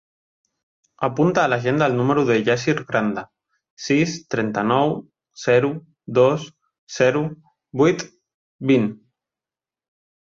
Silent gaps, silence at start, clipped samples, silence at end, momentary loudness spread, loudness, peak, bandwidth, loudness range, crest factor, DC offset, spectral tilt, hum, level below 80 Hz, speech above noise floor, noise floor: 3.70-3.77 s, 6.78-6.87 s, 8.34-8.59 s; 1 s; under 0.1%; 1.3 s; 13 LU; -20 LUFS; -4 dBFS; 7.6 kHz; 2 LU; 18 dB; under 0.1%; -6 dB/octave; none; -60 dBFS; over 71 dB; under -90 dBFS